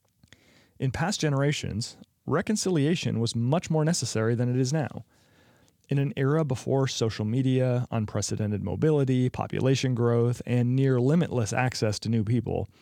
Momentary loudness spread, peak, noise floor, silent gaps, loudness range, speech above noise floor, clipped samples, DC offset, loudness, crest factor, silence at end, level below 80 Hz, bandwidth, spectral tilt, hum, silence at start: 6 LU; -8 dBFS; -61 dBFS; none; 3 LU; 35 dB; under 0.1%; under 0.1%; -26 LUFS; 18 dB; 0.15 s; -60 dBFS; 13 kHz; -6 dB/octave; none; 0.8 s